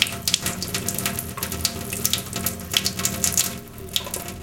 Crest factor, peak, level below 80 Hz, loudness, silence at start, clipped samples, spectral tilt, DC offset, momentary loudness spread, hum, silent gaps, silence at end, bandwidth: 26 dB; 0 dBFS; -48 dBFS; -23 LUFS; 0 s; under 0.1%; -1.5 dB/octave; under 0.1%; 7 LU; none; none; 0 s; 17.5 kHz